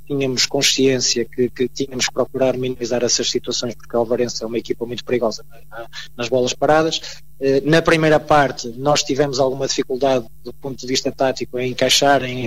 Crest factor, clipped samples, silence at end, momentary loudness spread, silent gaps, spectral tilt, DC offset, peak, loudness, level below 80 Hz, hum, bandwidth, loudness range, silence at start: 14 dB; under 0.1%; 0 s; 11 LU; none; -3.5 dB/octave; 2%; -4 dBFS; -18 LUFS; -46 dBFS; none; 16 kHz; 4 LU; 0.1 s